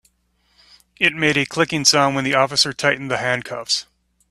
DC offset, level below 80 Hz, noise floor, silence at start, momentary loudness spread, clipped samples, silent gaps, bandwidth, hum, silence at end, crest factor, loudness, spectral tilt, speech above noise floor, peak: under 0.1%; -58 dBFS; -64 dBFS; 1 s; 8 LU; under 0.1%; none; 14 kHz; none; 0.5 s; 20 dB; -18 LUFS; -2.5 dB/octave; 45 dB; 0 dBFS